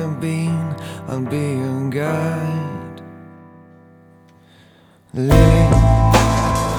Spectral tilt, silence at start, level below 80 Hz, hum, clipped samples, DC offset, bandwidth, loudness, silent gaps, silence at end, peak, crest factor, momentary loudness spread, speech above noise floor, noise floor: -6.5 dB/octave; 0 s; -24 dBFS; none; under 0.1%; under 0.1%; 19 kHz; -17 LUFS; none; 0 s; 0 dBFS; 18 dB; 17 LU; 36 dB; -50 dBFS